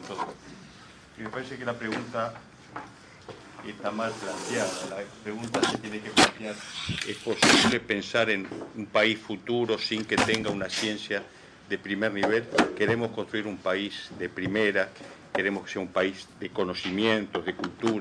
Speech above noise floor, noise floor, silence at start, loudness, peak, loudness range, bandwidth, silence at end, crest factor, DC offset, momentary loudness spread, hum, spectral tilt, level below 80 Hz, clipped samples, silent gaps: 22 dB; -50 dBFS; 0 s; -28 LUFS; -6 dBFS; 10 LU; 11 kHz; 0 s; 24 dB; under 0.1%; 17 LU; none; -3.5 dB/octave; -60 dBFS; under 0.1%; none